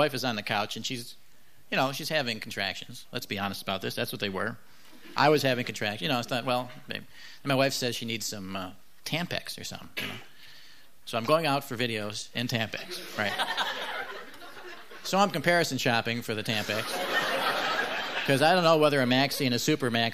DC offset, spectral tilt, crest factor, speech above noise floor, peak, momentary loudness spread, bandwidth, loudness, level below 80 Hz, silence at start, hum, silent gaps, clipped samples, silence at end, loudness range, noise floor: 0.5%; -4 dB/octave; 20 dB; 27 dB; -8 dBFS; 15 LU; 15.5 kHz; -28 LUFS; -68 dBFS; 0 s; none; none; under 0.1%; 0 s; 7 LU; -56 dBFS